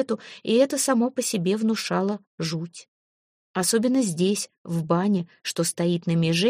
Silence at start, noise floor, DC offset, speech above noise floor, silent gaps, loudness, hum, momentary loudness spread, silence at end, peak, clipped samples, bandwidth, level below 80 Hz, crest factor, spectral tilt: 0 s; under -90 dBFS; under 0.1%; over 66 dB; 2.27-2.38 s, 2.88-3.54 s, 4.58-4.65 s; -24 LUFS; none; 9 LU; 0 s; -8 dBFS; under 0.1%; 15.5 kHz; -68 dBFS; 16 dB; -4.5 dB/octave